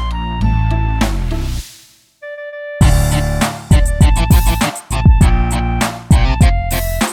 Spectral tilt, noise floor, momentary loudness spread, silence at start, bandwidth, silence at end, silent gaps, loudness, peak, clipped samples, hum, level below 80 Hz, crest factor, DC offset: -5.5 dB/octave; -45 dBFS; 16 LU; 0 s; 18.5 kHz; 0 s; none; -15 LUFS; 0 dBFS; under 0.1%; none; -16 dBFS; 12 dB; under 0.1%